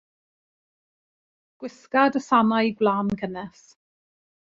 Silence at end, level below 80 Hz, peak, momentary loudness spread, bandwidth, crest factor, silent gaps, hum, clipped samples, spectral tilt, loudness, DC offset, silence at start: 1 s; -62 dBFS; -6 dBFS; 20 LU; 7.6 kHz; 20 dB; none; none; under 0.1%; -6 dB/octave; -22 LUFS; under 0.1%; 1.6 s